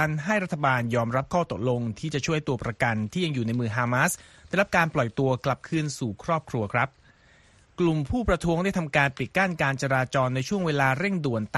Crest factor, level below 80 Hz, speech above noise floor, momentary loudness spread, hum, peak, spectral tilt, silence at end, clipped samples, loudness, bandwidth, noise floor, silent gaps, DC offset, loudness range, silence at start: 20 dB; -48 dBFS; 32 dB; 5 LU; none; -6 dBFS; -5.5 dB/octave; 0 s; under 0.1%; -26 LUFS; 13 kHz; -57 dBFS; none; under 0.1%; 3 LU; 0 s